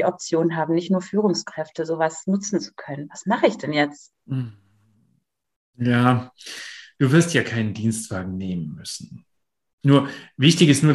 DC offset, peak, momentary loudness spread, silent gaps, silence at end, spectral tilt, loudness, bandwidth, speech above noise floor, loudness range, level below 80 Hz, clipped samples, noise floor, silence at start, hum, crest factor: under 0.1%; -2 dBFS; 16 LU; 5.56-5.73 s, 9.73-9.78 s; 0 s; -5.5 dB/octave; -22 LUFS; 12.5 kHz; 48 dB; 4 LU; -62 dBFS; under 0.1%; -69 dBFS; 0 s; none; 20 dB